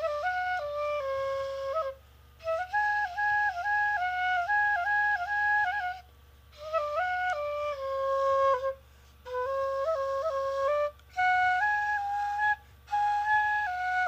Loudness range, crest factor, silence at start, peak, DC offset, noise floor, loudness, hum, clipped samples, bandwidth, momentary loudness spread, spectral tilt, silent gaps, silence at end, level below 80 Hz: 3 LU; 12 dB; 0 s; -16 dBFS; under 0.1%; -55 dBFS; -29 LUFS; none; under 0.1%; 15.5 kHz; 8 LU; -2 dB/octave; none; 0 s; -58 dBFS